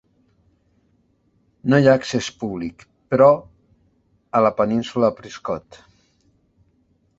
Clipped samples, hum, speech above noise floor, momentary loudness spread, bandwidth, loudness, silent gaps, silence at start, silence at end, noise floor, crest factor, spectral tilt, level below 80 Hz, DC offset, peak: under 0.1%; none; 44 dB; 15 LU; 8 kHz; -19 LUFS; none; 1.65 s; 1.6 s; -63 dBFS; 20 dB; -6.5 dB/octave; -56 dBFS; under 0.1%; -2 dBFS